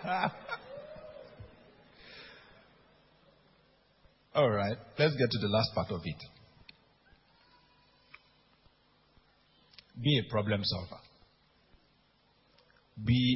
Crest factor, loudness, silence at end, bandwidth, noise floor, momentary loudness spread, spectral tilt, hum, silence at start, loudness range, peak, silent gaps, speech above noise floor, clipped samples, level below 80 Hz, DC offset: 22 dB; -32 LUFS; 0 s; 5.8 kHz; -69 dBFS; 24 LU; -9.5 dB/octave; none; 0 s; 17 LU; -12 dBFS; none; 38 dB; under 0.1%; -58 dBFS; under 0.1%